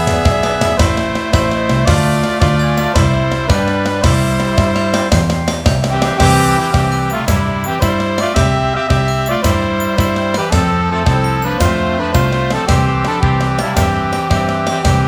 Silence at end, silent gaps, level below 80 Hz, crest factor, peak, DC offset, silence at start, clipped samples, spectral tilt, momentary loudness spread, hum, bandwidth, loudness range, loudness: 0 s; none; -24 dBFS; 14 dB; 0 dBFS; 0.4%; 0 s; under 0.1%; -5.5 dB/octave; 3 LU; none; over 20 kHz; 1 LU; -14 LUFS